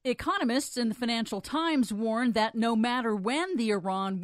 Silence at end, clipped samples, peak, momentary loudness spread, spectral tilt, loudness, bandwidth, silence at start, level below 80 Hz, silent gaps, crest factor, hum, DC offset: 0 s; under 0.1%; -14 dBFS; 3 LU; -4.5 dB/octave; -28 LUFS; 14.5 kHz; 0.05 s; -62 dBFS; none; 14 dB; none; under 0.1%